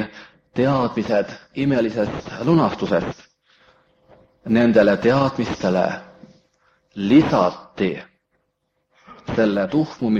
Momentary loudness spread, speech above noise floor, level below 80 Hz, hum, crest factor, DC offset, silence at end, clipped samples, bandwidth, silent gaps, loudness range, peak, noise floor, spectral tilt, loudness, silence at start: 16 LU; 53 dB; -52 dBFS; none; 18 dB; under 0.1%; 0 s; under 0.1%; 7.6 kHz; none; 4 LU; -2 dBFS; -72 dBFS; -7.5 dB/octave; -20 LUFS; 0 s